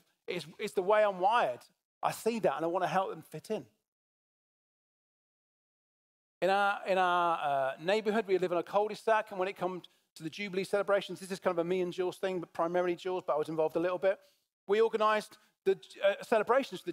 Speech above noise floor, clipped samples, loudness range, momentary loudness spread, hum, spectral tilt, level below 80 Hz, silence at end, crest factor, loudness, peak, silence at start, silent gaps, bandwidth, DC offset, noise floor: over 59 dB; under 0.1%; 6 LU; 11 LU; none; -5 dB/octave; -82 dBFS; 0 s; 18 dB; -32 LUFS; -14 dBFS; 0.3 s; 1.84-2.01 s, 3.88-6.41 s, 10.10-10.16 s, 14.53-14.67 s; 16 kHz; under 0.1%; under -90 dBFS